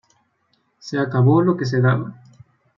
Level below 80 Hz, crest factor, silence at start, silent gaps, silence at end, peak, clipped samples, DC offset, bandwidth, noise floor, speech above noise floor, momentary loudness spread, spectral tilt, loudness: -64 dBFS; 16 dB; 0.85 s; none; 0.65 s; -4 dBFS; under 0.1%; under 0.1%; 7.2 kHz; -66 dBFS; 49 dB; 16 LU; -8 dB/octave; -19 LUFS